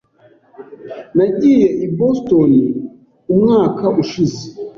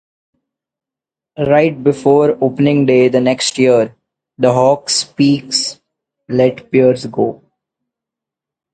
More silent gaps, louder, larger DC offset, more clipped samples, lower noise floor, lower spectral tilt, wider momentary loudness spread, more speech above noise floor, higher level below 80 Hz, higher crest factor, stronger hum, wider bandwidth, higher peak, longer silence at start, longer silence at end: neither; about the same, -14 LUFS vs -13 LUFS; neither; neither; second, -50 dBFS vs -87 dBFS; first, -8 dB/octave vs -5 dB/octave; first, 18 LU vs 8 LU; second, 37 dB vs 75 dB; about the same, -52 dBFS vs -56 dBFS; about the same, 12 dB vs 14 dB; neither; second, 7.2 kHz vs 9.4 kHz; about the same, -2 dBFS vs 0 dBFS; second, 0.6 s vs 1.4 s; second, 0.1 s vs 1.4 s